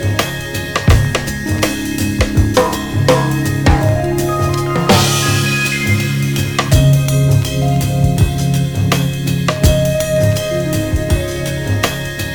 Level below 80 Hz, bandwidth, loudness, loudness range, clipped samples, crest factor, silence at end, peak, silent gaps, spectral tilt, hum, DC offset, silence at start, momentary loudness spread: -24 dBFS; 19.5 kHz; -14 LUFS; 2 LU; under 0.1%; 14 dB; 0 s; 0 dBFS; none; -5 dB/octave; none; under 0.1%; 0 s; 6 LU